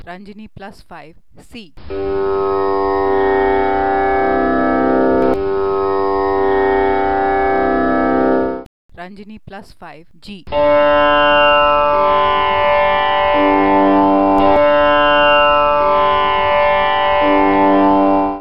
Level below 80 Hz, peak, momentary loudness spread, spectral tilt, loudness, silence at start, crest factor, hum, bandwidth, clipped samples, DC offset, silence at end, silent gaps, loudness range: -38 dBFS; 0 dBFS; 8 LU; -7 dB/octave; -13 LUFS; 0 s; 12 dB; none; 5.6 kHz; under 0.1%; 3%; 0 s; 8.66-8.89 s; 6 LU